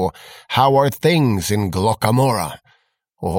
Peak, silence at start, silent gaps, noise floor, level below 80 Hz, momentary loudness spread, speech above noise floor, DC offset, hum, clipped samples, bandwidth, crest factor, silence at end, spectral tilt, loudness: -2 dBFS; 0 s; none; -62 dBFS; -46 dBFS; 9 LU; 45 dB; under 0.1%; none; under 0.1%; 17 kHz; 16 dB; 0 s; -5.5 dB/octave; -17 LUFS